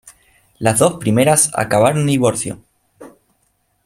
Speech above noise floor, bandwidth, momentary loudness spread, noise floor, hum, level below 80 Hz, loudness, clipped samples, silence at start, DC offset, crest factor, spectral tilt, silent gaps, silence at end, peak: 49 dB; 16 kHz; 11 LU; -64 dBFS; none; -52 dBFS; -15 LUFS; under 0.1%; 0.6 s; under 0.1%; 18 dB; -4.5 dB/octave; none; 0.75 s; 0 dBFS